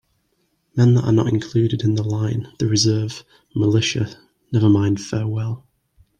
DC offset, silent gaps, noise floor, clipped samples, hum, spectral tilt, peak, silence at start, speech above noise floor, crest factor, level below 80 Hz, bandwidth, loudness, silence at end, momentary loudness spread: under 0.1%; none; -67 dBFS; under 0.1%; none; -6 dB/octave; -4 dBFS; 0.75 s; 49 dB; 16 dB; -54 dBFS; 9.4 kHz; -20 LUFS; 0.6 s; 12 LU